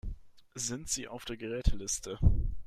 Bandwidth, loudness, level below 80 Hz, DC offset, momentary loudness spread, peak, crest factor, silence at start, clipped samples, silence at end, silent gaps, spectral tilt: 15 kHz; -34 LUFS; -36 dBFS; under 0.1%; 16 LU; -12 dBFS; 20 dB; 0.05 s; under 0.1%; 0.05 s; none; -4 dB/octave